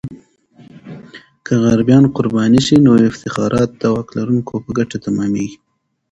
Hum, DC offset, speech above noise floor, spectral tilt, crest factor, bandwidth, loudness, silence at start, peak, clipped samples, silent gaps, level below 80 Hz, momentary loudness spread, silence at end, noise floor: none; under 0.1%; 32 dB; -7 dB/octave; 16 dB; 9.2 kHz; -14 LUFS; 0.05 s; 0 dBFS; under 0.1%; none; -46 dBFS; 22 LU; 0.6 s; -46 dBFS